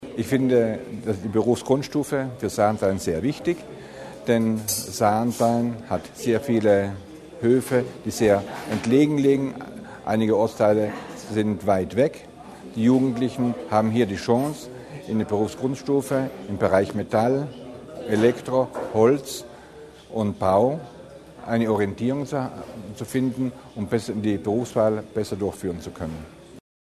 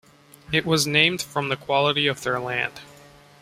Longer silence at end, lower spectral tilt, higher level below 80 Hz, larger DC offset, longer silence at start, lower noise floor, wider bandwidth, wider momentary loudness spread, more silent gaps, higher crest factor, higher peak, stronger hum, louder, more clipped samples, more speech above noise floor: second, 0.3 s vs 0.55 s; first, -6 dB/octave vs -3.5 dB/octave; about the same, -54 dBFS vs -58 dBFS; neither; second, 0 s vs 0.5 s; second, -44 dBFS vs -49 dBFS; second, 13.5 kHz vs 16 kHz; first, 15 LU vs 8 LU; neither; about the same, 18 dB vs 22 dB; about the same, -4 dBFS vs -2 dBFS; neither; about the same, -23 LUFS vs -22 LUFS; neither; second, 22 dB vs 26 dB